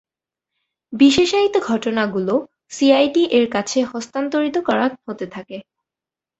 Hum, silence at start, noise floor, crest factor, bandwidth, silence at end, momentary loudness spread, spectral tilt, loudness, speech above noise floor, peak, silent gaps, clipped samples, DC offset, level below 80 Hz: none; 0.9 s; -88 dBFS; 18 dB; 8.2 kHz; 0.8 s; 16 LU; -4 dB/octave; -18 LUFS; 71 dB; -2 dBFS; none; under 0.1%; under 0.1%; -56 dBFS